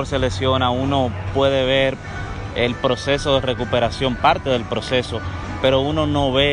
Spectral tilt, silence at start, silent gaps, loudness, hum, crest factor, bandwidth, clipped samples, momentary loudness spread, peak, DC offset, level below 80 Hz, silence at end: -5.5 dB/octave; 0 s; none; -19 LUFS; none; 14 dB; 10.5 kHz; under 0.1%; 9 LU; -4 dBFS; under 0.1%; -36 dBFS; 0 s